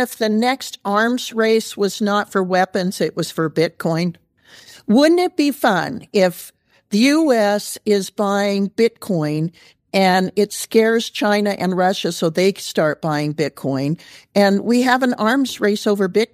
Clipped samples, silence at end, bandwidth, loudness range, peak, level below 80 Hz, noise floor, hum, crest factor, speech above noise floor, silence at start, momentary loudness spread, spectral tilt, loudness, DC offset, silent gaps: under 0.1%; 0.1 s; 15.5 kHz; 2 LU; -2 dBFS; -66 dBFS; -46 dBFS; none; 16 dB; 28 dB; 0 s; 7 LU; -5 dB/octave; -18 LUFS; under 0.1%; none